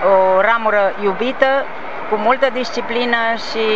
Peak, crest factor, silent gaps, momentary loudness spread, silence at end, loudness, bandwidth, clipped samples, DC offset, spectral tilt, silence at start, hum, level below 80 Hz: 0 dBFS; 16 dB; none; 9 LU; 0 s; -16 LUFS; 7.8 kHz; under 0.1%; 4%; -4.5 dB/octave; 0 s; none; -56 dBFS